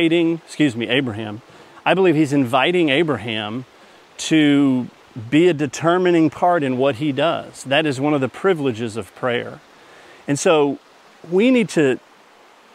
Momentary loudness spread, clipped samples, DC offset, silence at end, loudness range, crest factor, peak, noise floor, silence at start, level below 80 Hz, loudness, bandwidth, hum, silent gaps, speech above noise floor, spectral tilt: 12 LU; under 0.1%; under 0.1%; 0.8 s; 4 LU; 18 dB; 0 dBFS; -49 dBFS; 0 s; -66 dBFS; -18 LUFS; 13 kHz; none; none; 31 dB; -5.5 dB/octave